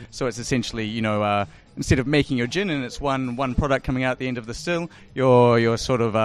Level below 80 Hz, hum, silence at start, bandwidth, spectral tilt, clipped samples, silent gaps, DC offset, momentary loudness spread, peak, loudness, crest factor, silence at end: -40 dBFS; none; 0 s; 13 kHz; -6 dB/octave; under 0.1%; none; under 0.1%; 10 LU; -6 dBFS; -22 LUFS; 16 dB; 0 s